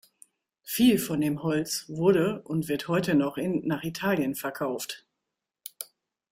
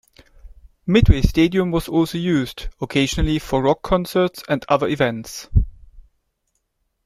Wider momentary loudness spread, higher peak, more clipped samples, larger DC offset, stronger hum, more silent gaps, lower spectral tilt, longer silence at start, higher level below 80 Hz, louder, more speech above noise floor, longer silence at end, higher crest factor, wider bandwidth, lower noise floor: first, 18 LU vs 8 LU; second, -10 dBFS vs -2 dBFS; neither; neither; neither; neither; about the same, -5 dB/octave vs -6 dB/octave; first, 0.65 s vs 0.45 s; second, -64 dBFS vs -28 dBFS; second, -27 LUFS vs -19 LUFS; first, 59 dB vs 54 dB; second, 0.5 s vs 1.05 s; about the same, 18 dB vs 18 dB; about the same, 16 kHz vs 15.5 kHz; first, -86 dBFS vs -72 dBFS